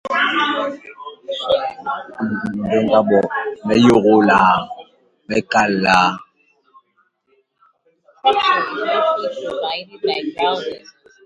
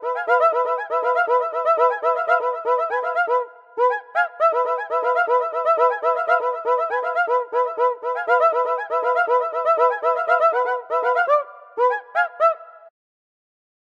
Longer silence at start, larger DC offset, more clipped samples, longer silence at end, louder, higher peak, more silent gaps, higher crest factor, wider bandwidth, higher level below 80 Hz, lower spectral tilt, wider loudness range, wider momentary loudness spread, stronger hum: about the same, 0.05 s vs 0 s; neither; neither; second, 0.45 s vs 1.1 s; first, -17 LUFS vs -20 LUFS; first, 0 dBFS vs -4 dBFS; neither; about the same, 18 dB vs 16 dB; first, 11 kHz vs 7.2 kHz; first, -54 dBFS vs -86 dBFS; first, -5 dB/octave vs -1.5 dB/octave; first, 5 LU vs 2 LU; first, 14 LU vs 4 LU; neither